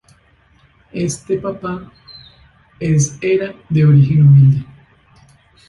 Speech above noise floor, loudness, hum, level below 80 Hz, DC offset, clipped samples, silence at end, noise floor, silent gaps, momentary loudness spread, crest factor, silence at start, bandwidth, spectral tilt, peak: 40 dB; -14 LUFS; none; -46 dBFS; under 0.1%; under 0.1%; 1.05 s; -53 dBFS; none; 16 LU; 14 dB; 0.95 s; 11.5 kHz; -7.5 dB/octave; -2 dBFS